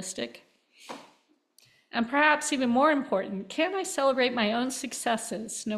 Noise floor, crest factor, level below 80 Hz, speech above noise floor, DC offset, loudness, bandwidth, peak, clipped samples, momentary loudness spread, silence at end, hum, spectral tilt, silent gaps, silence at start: -65 dBFS; 20 dB; -72 dBFS; 38 dB; under 0.1%; -27 LUFS; 14.5 kHz; -8 dBFS; under 0.1%; 15 LU; 0 s; none; -3 dB/octave; none; 0 s